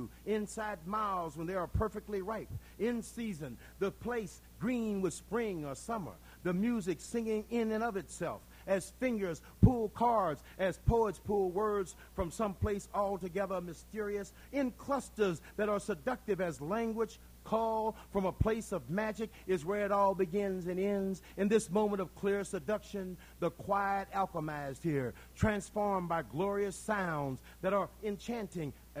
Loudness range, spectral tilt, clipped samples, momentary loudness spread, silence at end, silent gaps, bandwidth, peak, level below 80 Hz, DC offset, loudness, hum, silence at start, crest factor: 5 LU; -6.5 dB/octave; under 0.1%; 9 LU; 0 s; none; 16.5 kHz; -10 dBFS; -52 dBFS; under 0.1%; -36 LUFS; none; 0 s; 24 dB